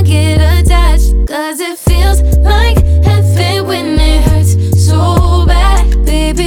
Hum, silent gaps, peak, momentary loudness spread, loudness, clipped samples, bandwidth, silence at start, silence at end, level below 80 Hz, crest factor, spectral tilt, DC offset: none; none; 0 dBFS; 4 LU; -10 LUFS; under 0.1%; 16 kHz; 0 s; 0 s; -10 dBFS; 8 dB; -5.5 dB/octave; under 0.1%